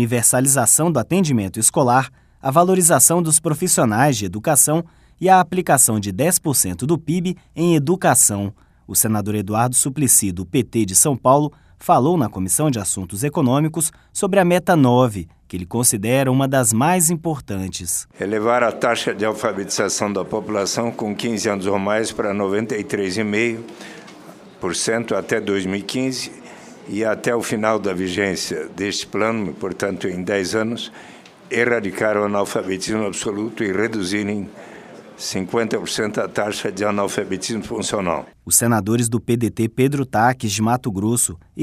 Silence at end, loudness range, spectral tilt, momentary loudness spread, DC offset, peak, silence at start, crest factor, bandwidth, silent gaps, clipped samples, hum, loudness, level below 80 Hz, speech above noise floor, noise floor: 0 s; 7 LU; -4 dB/octave; 11 LU; under 0.1%; 0 dBFS; 0 s; 18 dB; 15.5 kHz; none; under 0.1%; none; -18 LUFS; -52 dBFS; 23 dB; -41 dBFS